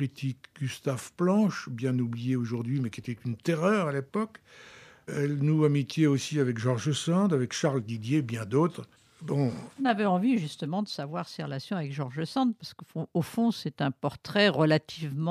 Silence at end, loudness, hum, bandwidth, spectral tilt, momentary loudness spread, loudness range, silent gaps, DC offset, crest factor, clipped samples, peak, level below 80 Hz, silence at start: 0 s; -29 LUFS; none; 14.5 kHz; -6.5 dB/octave; 11 LU; 4 LU; none; under 0.1%; 18 dB; under 0.1%; -10 dBFS; -72 dBFS; 0 s